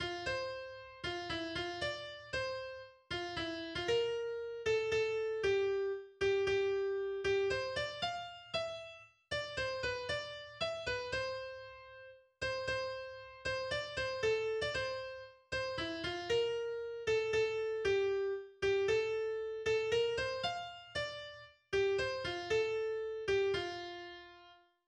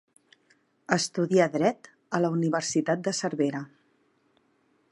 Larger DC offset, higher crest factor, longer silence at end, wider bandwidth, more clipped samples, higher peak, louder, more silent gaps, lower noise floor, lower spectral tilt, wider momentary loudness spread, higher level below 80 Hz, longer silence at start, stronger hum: neither; second, 16 dB vs 22 dB; second, 0.3 s vs 1.25 s; second, 10 kHz vs 11.5 kHz; neither; second, -22 dBFS vs -6 dBFS; second, -37 LUFS vs -27 LUFS; neither; second, -62 dBFS vs -68 dBFS; about the same, -4 dB/octave vs -5 dB/octave; first, 12 LU vs 9 LU; first, -62 dBFS vs -76 dBFS; second, 0 s vs 0.9 s; neither